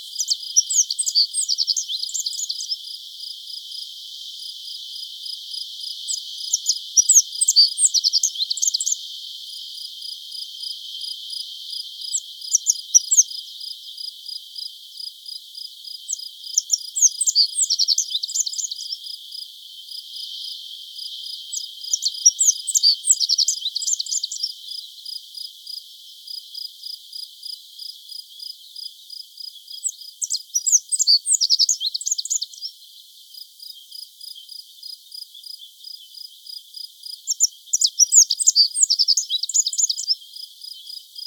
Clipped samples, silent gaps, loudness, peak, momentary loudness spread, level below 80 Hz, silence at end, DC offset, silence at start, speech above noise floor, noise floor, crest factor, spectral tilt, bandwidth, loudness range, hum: under 0.1%; none; -18 LUFS; -2 dBFS; 21 LU; under -90 dBFS; 0 s; under 0.1%; 0 s; 26 dB; -46 dBFS; 22 dB; 13.5 dB/octave; 19.5 kHz; 17 LU; none